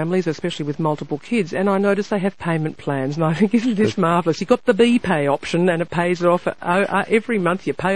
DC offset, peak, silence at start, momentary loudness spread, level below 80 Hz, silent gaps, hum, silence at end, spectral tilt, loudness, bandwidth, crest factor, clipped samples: 0.7%; -2 dBFS; 0 s; 6 LU; -54 dBFS; none; none; 0 s; -6.5 dB/octave; -19 LUFS; 11 kHz; 16 dB; under 0.1%